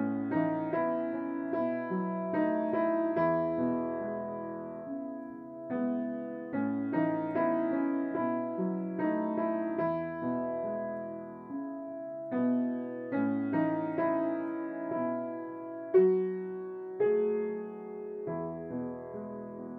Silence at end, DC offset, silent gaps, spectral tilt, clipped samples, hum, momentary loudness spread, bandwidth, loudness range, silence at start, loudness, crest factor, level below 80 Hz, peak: 0 s; under 0.1%; none; -11 dB/octave; under 0.1%; none; 11 LU; 4.3 kHz; 4 LU; 0 s; -33 LUFS; 18 dB; -74 dBFS; -14 dBFS